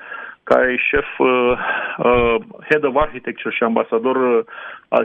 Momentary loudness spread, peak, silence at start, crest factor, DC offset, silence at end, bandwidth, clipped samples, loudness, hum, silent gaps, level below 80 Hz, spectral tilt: 9 LU; 0 dBFS; 0 s; 18 dB; under 0.1%; 0 s; 5.8 kHz; under 0.1%; -17 LUFS; none; none; -40 dBFS; -7 dB/octave